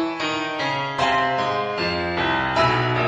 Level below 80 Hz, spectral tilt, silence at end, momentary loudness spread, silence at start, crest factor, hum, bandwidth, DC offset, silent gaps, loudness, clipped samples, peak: -48 dBFS; -5 dB/octave; 0 s; 5 LU; 0 s; 16 dB; none; 9.6 kHz; under 0.1%; none; -21 LUFS; under 0.1%; -6 dBFS